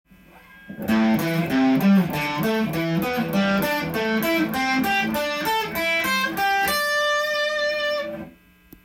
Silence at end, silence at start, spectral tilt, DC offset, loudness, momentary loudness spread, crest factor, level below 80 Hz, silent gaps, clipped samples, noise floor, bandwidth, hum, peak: 0.55 s; 0.35 s; -5 dB/octave; under 0.1%; -21 LUFS; 4 LU; 14 dB; -54 dBFS; none; under 0.1%; -51 dBFS; 17 kHz; none; -10 dBFS